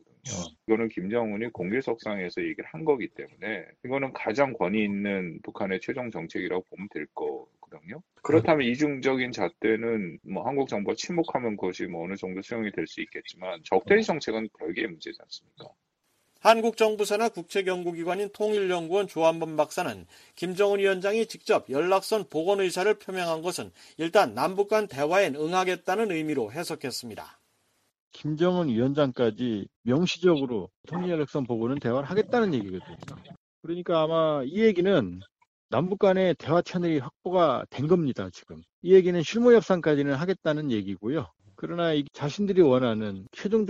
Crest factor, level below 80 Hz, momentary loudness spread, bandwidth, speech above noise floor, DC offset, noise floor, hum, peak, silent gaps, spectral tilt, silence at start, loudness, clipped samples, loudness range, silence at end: 20 dB; -66 dBFS; 14 LU; 14 kHz; 46 dB; under 0.1%; -72 dBFS; none; -6 dBFS; 28.00-28.11 s, 29.76-29.84 s, 30.76-30.84 s, 33.37-33.63 s, 35.47-35.69 s, 37.16-37.20 s, 38.73-38.82 s; -6 dB/octave; 0.25 s; -27 LUFS; under 0.1%; 6 LU; 0 s